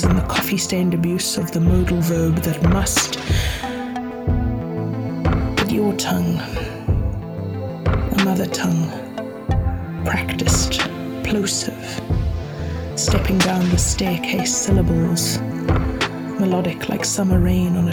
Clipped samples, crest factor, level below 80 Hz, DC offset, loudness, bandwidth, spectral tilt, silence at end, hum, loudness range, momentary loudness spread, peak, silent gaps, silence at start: under 0.1%; 16 dB; -28 dBFS; under 0.1%; -20 LUFS; 19 kHz; -5 dB/octave; 0 s; none; 3 LU; 9 LU; -4 dBFS; none; 0 s